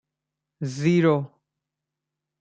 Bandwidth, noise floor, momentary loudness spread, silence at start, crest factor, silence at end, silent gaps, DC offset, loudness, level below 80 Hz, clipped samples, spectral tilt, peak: 8.8 kHz; -85 dBFS; 15 LU; 0.6 s; 18 dB; 1.15 s; none; under 0.1%; -22 LUFS; -68 dBFS; under 0.1%; -7.5 dB/octave; -8 dBFS